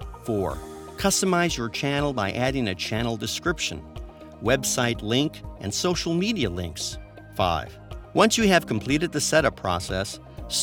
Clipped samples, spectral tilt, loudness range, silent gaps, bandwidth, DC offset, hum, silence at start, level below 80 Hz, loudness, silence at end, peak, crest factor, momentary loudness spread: under 0.1%; -4 dB/octave; 3 LU; none; 19 kHz; under 0.1%; none; 0 s; -42 dBFS; -24 LUFS; 0 s; -2 dBFS; 22 dB; 15 LU